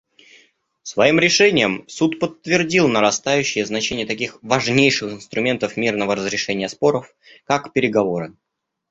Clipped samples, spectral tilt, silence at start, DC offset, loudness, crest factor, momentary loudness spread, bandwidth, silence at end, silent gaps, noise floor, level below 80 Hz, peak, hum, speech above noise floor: under 0.1%; -4 dB/octave; 0.85 s; under 0.1%; -18 LUFS; 18 dB; 10 LU; 8 kHz; 0.6 s; none; -56 dBFS; -56 dBFS; -2 dBFS; none; 37 dB